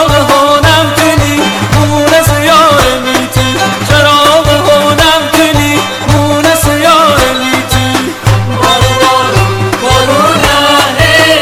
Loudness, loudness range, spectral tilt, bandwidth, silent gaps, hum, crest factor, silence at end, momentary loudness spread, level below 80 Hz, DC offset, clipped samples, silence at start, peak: -7 LUFS; 2 LU; -4 dB/octave; 19 kHz; none; none; 8 dB; 0 s; 5 LU; -24 dBFS; under 0.1%; 2%; 0 s; 0 dBFS